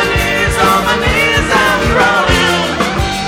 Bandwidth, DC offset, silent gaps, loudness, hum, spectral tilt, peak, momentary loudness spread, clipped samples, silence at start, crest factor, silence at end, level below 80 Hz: 17 kHz; under 0.1%; none; -11 LUFS; none; -4 dB/octave; 0 dBFS; 3 LU; under 0.1%; 0 s; 12 dB; 0 s; -24 dBFS